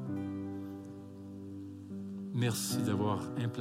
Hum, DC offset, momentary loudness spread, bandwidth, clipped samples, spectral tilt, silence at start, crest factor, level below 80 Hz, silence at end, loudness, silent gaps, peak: none; under 0.1%; 14 LU; 16 kHz; under 0.1%; -5.5 dB/octave; 0 s; 18 dB; -74 dBFS; 0 s; -37 LUFS; none; -20 dBFS